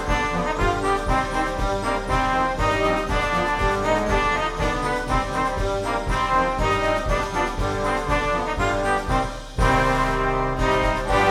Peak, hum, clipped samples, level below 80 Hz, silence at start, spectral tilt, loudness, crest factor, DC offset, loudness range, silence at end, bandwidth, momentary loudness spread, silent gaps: -6 dBFS; none; under 0.1%; -30 dBFS; 0 s; -5 dB/octave; -22 LUFS; 16 dB; under 0.1%; 1 LU; 0 s; 14.5 kHz; 4 LU; none